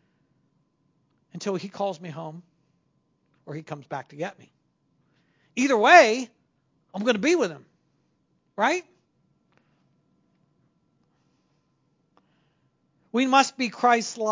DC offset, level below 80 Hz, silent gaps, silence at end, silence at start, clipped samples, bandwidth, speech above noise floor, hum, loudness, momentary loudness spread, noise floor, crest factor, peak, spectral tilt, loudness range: under 0.1%; -82 dBFS; none; 0 s; 1.35 s; under 0.1%; 7.6 kHz; 48 dB; none; -22 LUFS; 24 LU; -70 dBFS; 26 dB; 0 dBFS; -3.5 dB/octave; 15 LU